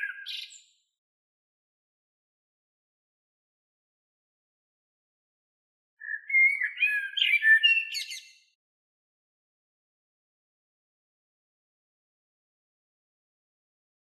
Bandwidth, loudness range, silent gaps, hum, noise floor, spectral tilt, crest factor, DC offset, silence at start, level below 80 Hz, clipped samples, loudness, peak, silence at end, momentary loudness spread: 13.5 kHz; 21 LU; 0.98-5.97 s; none; under -90 dBFS; 11 dB/octave; 22 dB; under 0.1%; 0 s; under -90 dBFS; under 0.1%; -22 LUFS; -10 dBFS; 6 s; 19 LU